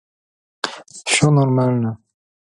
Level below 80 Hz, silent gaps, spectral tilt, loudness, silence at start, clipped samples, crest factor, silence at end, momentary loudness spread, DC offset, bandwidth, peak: -56 dBFS; none; -5 dB/octave; -18 LUFS; 0.65 s; under 0.1%; 20 dB; 0.6 s; 14 LU; under 0.1%; 11.5 kHz; 0 dBFS